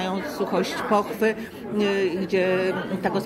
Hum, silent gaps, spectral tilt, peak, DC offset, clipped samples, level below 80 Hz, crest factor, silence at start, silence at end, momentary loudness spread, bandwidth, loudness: none; none; -5.5 dB/octave; -8 dBFS; under 0.1%; under 0.1%; -58 dBFS; 16 dB; 0 s; 0 s; 6 LU; 16 kHz; -24 LUFS